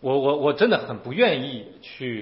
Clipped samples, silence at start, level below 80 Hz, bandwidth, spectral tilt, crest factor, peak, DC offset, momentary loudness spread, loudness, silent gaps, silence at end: under 0.1%; 0 s; -66 dBFS; 5.8 kHz; -10 dB/octave; 16 dB; -6 dBFS; under 0.1%; 14 LU; -22 LUFS; none; 0 s